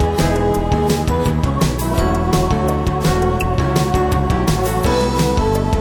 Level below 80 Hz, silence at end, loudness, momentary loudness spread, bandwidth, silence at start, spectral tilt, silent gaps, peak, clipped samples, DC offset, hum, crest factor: -22 dBFS; 0 s; -17 LUFS; 1 LU; 19 kHz; 0 s; -6 dB/octave; none; -2 dBFS; under 0.1%; under 0.1%; none; 12 dB